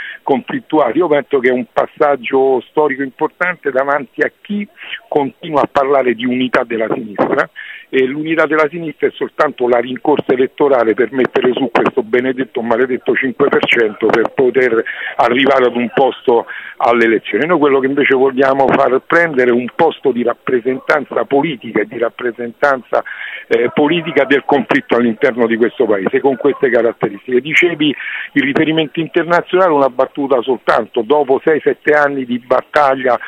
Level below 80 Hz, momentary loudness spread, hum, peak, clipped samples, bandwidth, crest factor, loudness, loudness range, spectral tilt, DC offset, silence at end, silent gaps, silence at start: -58 dBFS; 7 LU; none; 0 dBFS; under 0.1%; 8.2 kHz; 14 dB; -14 LUFS; 4 LU; -6.5 dB/octave; under 0.1%; 0 s; none; 0 s